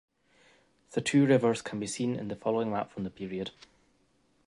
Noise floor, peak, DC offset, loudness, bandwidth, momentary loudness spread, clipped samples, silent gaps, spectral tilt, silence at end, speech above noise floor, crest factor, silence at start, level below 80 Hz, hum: -70 dBFS; -12 dBFS; under 0.1%; -30 LUFS; 11.5 kHz; 14 LU; under 0.1%; none; -5.5 dB/octave; 0.95 s; 40 dB; 20 dB; 0.9 s; -66 dBFS; none